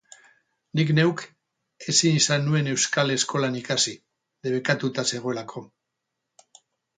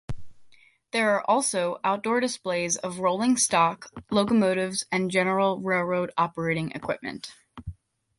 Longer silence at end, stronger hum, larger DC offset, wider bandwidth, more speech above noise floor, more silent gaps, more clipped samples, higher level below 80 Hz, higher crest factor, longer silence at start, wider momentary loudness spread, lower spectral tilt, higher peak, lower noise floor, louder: first, 1.3 s vs 0.45 s; neither; neither; second, 9.6 kHz vs 11.5 kHz; first, 58 dB vs 30 dB; neither; neither; second, -68 dBFS vs -54 dBFS; about the same, 22 dB vs 18 dB; first, 0.75 s vs 0.1 s; about the same, 16 LU vs 18 LU; about the same, -3.5 dB/octave vs -4 dB/octave; first, -4 dBFS vs -8 dBFS; first, -81 dBFS vs -55 dBFS; about the same, -23 LUFS vs -25 LUFS